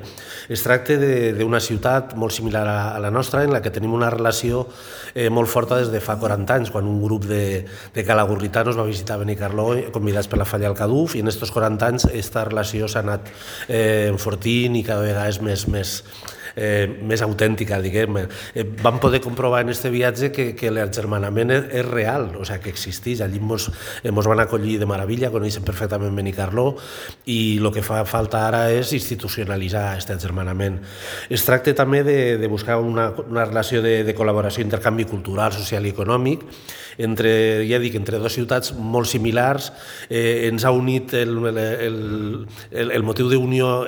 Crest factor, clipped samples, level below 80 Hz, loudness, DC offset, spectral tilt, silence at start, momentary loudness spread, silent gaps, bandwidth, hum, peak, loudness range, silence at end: 20 dB; under 0.1%; -42 dBFS; -21 LUFS; under 0.1%; -5.5 dB/octave; 0 s; 9 LU; none; over 20 kHz; none; 0 dBFS; 2 LU; 0 s